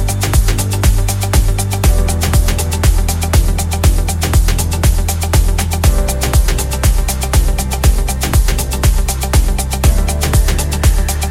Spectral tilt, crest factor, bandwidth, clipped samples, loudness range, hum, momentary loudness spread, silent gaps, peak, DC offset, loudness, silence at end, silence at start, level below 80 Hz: -4.5 dB/octave; 12 dB; 16.5 kHz; under 0.1%; 1 LU; none; 2 LU; none; 0 dBFS; under 0.1%; -14 LUFS; 0 s; 0 s; -14 dBFS